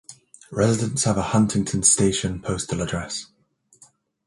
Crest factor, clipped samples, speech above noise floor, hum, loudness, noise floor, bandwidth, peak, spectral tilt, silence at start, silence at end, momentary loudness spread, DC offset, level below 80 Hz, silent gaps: 20 dB; under 0.1%; 35 dB; none; -21 LUFS; -57 dBFS; 11.5 kHz; -4 dBFS; -4.5 dB/octave; 0.1 s; 1.05 s; 12 LU; under 0.1%; -46 dBFS; none